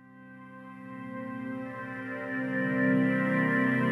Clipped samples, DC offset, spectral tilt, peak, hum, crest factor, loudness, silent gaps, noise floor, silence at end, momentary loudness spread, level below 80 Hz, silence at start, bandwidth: under 0.1%; under 0.1%; -8.5 dB/octave; -16 dBFS; none; 16 dB; -29 LUFS; none; -49 dBFS; 0 s; 21 LU; -74 dBFS; 0.05 s; 11 kHz